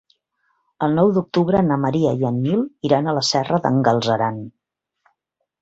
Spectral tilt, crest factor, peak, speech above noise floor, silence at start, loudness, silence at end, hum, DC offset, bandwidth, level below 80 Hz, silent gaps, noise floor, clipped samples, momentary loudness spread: -6 dB/octave; 18 dB; -2 dBFS; 57 dB; 0.8 s; -19 LUFS; 1.1 s; none; under 0.1%; 8 kHz; -54 dBFS; none; -75 dBFS; under 0.1%; 5 LU